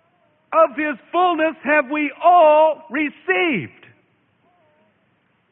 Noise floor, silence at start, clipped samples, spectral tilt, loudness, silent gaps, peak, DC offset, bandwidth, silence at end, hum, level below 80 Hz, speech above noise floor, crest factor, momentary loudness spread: -63 dBFS; 0.5 s; under 0.1%; -9.5 dB/octave; -17 LUFS; none; -4 dBFS; under 0.1%; 3.9 kHz; 1.85 s; none; -72 dBFS; 46 dB; 16 dB; 11 LU